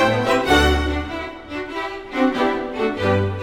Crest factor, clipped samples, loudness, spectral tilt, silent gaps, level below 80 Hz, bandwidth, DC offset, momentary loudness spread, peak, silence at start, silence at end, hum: 18 dB; under 0.1%; -20 LUFS; -5.5 dB/octave; none; -30 dBFS; 18 kHz; under 0.1%; 13 LU; -2 dBFS; 0 s; 0 s; none